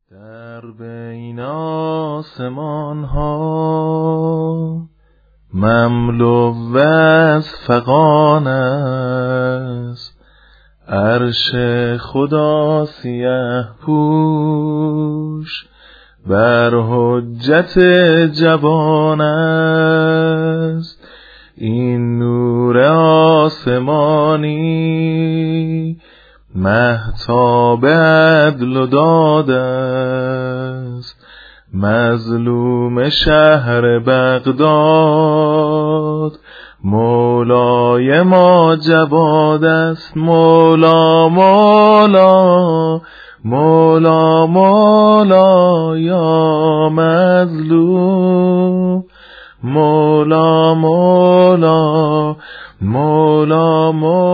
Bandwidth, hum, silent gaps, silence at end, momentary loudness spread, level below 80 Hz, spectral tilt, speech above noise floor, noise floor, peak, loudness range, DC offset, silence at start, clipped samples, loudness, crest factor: 5 kHz; none; none; 0 s; 13 LU; -40 dBFS; -9 dB/octave; 40 dB; -52 dBFS; 0 dBFS; 8 LU; under 0.1%; 0.25 s; under 0.1%; -12 LUFS; 12 dB